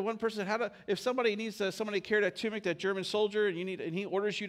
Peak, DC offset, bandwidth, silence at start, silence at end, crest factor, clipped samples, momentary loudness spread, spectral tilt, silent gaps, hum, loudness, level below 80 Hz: -16 dBFS; under 0.1%; 15 kHz; 0 s; 0 s; 16 dB; under 0.1%; 5 LU; -4.5 dB/octave; none; none; -33 LUFS; -76 dBFS